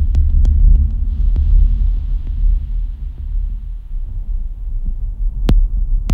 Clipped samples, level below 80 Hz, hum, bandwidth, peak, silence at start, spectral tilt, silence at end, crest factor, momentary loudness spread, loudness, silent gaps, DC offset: under 0.1%; -14 dBFS; none; 3.9 kHz; -2 dBFS; 0 s; -8.5 dB/octave; 0 s; 12 dB; 13 LU; -20 LUFS; none; under 0.1%